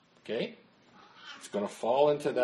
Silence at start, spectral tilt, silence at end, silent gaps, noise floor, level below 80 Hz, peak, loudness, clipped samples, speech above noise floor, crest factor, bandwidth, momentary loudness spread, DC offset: 0.25 s; -5 dB/octave; 0 s; none; -59 dBFS; -80 dBFS; -12 dBFS; -31 LUFS; under 0.1%; 29 dB; 20 dB; 12.5 kHz; 21 LU; under 0.1%